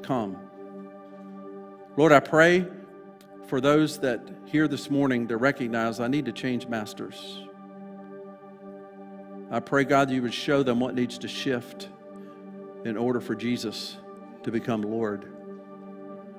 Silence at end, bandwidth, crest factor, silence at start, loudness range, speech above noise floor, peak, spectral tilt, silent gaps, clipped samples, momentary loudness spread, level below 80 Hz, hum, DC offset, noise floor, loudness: 0 s; 16 kHz; 24 dB; 0 s; 9 LU; 22 dB; -2 dBFS; -5.5 dB/octave; none; under 0.1%; 22 LU; -66 dBFS; none; under 0.1%; -47 dBFS; -26 LUFS